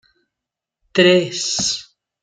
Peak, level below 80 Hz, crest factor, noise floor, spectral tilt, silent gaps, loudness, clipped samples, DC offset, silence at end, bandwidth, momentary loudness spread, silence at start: -2 dBFS; -58 dBFS; 18 dB; -85 dBFS; -3 dB/octave; none; -17 LUFS; under 0.1%; under 0.1%; 0.4 s; 9.6 kHz; 9 LU; 0.95 s